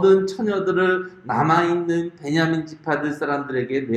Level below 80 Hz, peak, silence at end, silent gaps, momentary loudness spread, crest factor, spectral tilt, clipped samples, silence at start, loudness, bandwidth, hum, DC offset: -62 dBFS; -4 dBFS; 0 s; none; 7 LU; 16 dB; -6.5 dB/octave; under 0.1%; 0 s; -21 LUFS; 8.8 kHz; none; under 0.1%